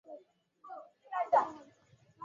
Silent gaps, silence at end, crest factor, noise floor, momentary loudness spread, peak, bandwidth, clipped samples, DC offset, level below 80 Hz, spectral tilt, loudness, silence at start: none; 0 s; 22 dB; -66 dBFS; 24 LU; -16 dBFS; 7.4 kHz; under 0.1%; under 0.1%; -84 dBFS; -2.5 dB/octave; -33 LUFS; 0.1 s